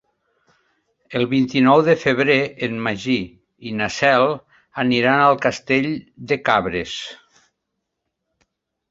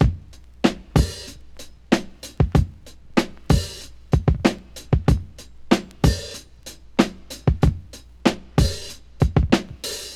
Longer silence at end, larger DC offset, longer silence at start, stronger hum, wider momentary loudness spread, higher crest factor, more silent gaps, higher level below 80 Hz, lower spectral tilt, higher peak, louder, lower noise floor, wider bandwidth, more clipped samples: first, 1.75 s vs 0 s; neither; first, 1.1 s vs 0 s; neither; second, 15 LU vs 18 LU; about the same, 20 dB vs 22 dB; neither; second, -54 dBFS vs -28 dBFS; about the same, -5.5 dB/octave vs -6 dB/octave; about the same, 0 dBFS vs 0 dBFS; first, -18 LUFS vs -22 LUFS; first, -78 dBFS vs -42 dBFS; second, 7.8 kHz vs 15 kHz; neither